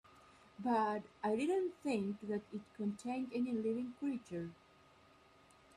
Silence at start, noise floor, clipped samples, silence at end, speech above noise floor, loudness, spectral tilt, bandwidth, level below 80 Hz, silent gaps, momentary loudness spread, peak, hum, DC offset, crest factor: 0.15 s; -66 dBFS; under 0.1%; 1.2 s; 27 dB; -40 LUFS; -6.5 dB/octave; 11.5 kHz; -78 dBFS; none; 10 LU; -24 dBFS; none; under 0.1%; 16 dB